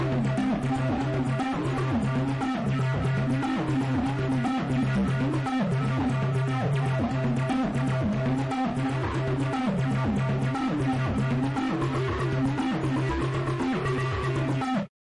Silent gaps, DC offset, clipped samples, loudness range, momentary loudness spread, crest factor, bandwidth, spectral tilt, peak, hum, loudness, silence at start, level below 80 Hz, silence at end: none; under 0.1%; under 0.1%; 1 LU; 2 LU; 8 dB; 11 kHz; -7.5 dB/octave; -18 dBFS; none; -27 LUFS; 0 s; -44 dBFS; 0.25 s